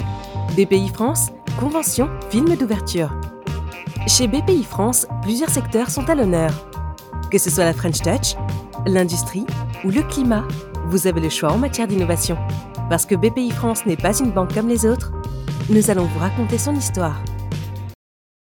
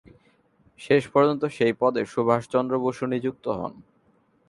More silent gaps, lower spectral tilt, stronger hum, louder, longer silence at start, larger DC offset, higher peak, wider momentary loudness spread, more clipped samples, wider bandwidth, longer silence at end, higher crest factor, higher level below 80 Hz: neither; second, -5 dB/octave vs -7 dB/octave; neither; first, -19 LUFS vs -24 LUFS; second, 0 s vs 0.8 s; neither; first, 0 dBFS vs -6 dBFS; about the same, 11 LU vs 9 LU; neither; first, 19.5 kHz vs 11.5 kHz; second, 0.5 s vs 0.7 s; about the same, 20 dB vs 20 dB; first, -34 dBFS vs -62 dBFS